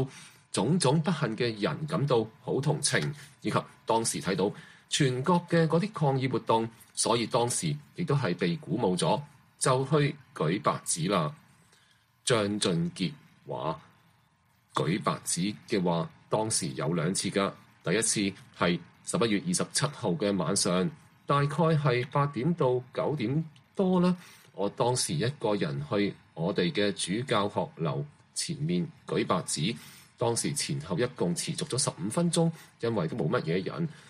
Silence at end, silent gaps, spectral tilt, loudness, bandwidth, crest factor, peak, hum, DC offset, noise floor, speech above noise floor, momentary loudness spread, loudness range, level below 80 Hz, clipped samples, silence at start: 0.1 s; none; -4.5 dB/octave; -29 LUFS; 14.5 kHz; 20 dB; -10 dBFS; none; under 0.1%; -67 dBFS; 38 dB; 8 LU; 3 LU; -66 dBFS; under 0.1%; 0 s